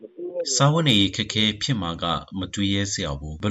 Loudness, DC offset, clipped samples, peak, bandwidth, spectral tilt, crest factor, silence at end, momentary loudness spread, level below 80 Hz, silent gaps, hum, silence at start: -22 LUFS; under 0.1%; under 0.1%; -6 dBFS; 11 kHz; -4 dB/octave; 18 dB; 0 s; 11 LU; -44 dBFS; none; none; 0 s